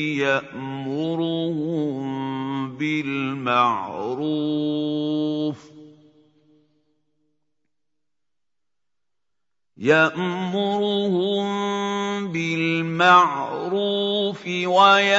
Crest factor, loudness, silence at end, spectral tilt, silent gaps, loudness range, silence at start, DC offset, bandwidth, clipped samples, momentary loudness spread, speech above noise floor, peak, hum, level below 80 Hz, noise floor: 20 dB; -22 LUFS; 0 s; -5.5 dB/octave; none; 8 LU; 0 s; under 0.1%; 7.8 kHz; under 0.1%; 11 LU; 66 dB; -2 dBFS; none; -70 dBFS; -87 dBFS